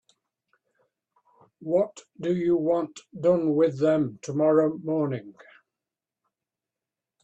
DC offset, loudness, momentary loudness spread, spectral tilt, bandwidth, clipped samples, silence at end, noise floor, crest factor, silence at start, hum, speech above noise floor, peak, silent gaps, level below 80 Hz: under 0.1%; -25 LUFS; 10 LU; -8 dB/octave; 8.4 kHz; under 0.1%; 1.9 s; -89 dBFS; 18 dB; 1.6 s; none; 65 dB; -10 dBFS; none; -70 dBFS